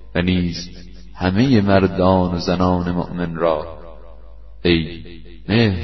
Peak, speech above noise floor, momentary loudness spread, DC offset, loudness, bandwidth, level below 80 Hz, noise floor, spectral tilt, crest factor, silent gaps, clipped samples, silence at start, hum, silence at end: -2 dBFS; 23 dB; 19 LU; 1%; -18 LUFS; 6.2 kHz; -38 dBFS; -40 dBFS; -7 dB/octave; 18 dB; none; under 0.1%; 0 s; none; 0 s